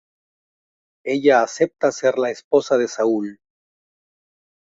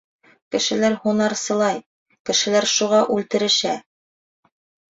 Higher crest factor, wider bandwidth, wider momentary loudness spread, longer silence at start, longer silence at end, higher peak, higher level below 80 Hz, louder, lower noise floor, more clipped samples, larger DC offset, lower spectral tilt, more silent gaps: about the same, 20 dB vs 16 dB; about the same, 8 kHz vs 8 kHz; about the same, 9 LU vs 9 LU; first, 1.05 s vs 0.5 s; first, 1.35 s vs 1.15 s; about the same, -2 dBFS vs -4 dBFS; about the same, -68 dBFS vs -64 dBFS; about the same, -19 LUFS vs -20 LUFS; about the same, under -90 dBFS vs under -90 dBFS; neither; neither; first, -4.5 dB/octave vs -2.5 dB/octave; second, 2.44-2.51 s vs 1.86-2.06 s, 2.20-2.25 s